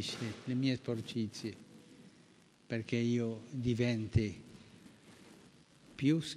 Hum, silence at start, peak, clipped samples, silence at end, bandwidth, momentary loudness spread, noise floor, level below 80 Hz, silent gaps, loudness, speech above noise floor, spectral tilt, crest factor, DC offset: none; 0 s; -18 dBFS; under 0.1%; 0 s; 12.5 kHz; 24 LU; -64 dBFS; -60 dBFS; none; -36 LUFS; 29 dB; -6.5 dB/octave; 20 dB; under 0.1%